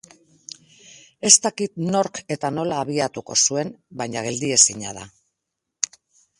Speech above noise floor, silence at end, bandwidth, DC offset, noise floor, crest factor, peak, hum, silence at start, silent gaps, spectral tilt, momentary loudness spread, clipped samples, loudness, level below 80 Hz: 59 dB; 1.3 s; 16 kHz; under 0.1%; -81 dBFS; 24 dB; 0 dBFS; none; 0.9 s; none; -2 dB/octave; 18 LU; under 0.1%; -20 LUFS; -64 dBFS